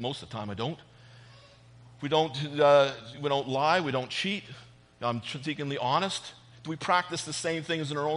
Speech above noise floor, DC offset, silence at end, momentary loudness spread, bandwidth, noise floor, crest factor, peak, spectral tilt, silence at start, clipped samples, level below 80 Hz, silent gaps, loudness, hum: 25 dB; under 0.1%; 0 s; 14 LU; 10.5 kHz; -54 dBFS; 20 dB; -10 dBFS; -4.5 dB/octave; 0 s; under 0.1%; -68 dBFS; none; -29 LUFS; none